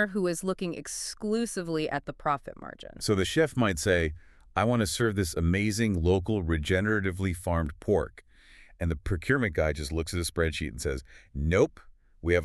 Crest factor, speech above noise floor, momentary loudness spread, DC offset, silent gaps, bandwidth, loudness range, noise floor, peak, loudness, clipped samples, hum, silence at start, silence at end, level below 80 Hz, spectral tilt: 18 dB; 26 dB; 9 LU; under 0.1%; none; 13.5 kHz; 4 LU; -54 dBFS; -10 dBFS; -29 LUFS; under 0.1%; none; 0 s; 0 s; -42 dBFS; -5.5 dB/octave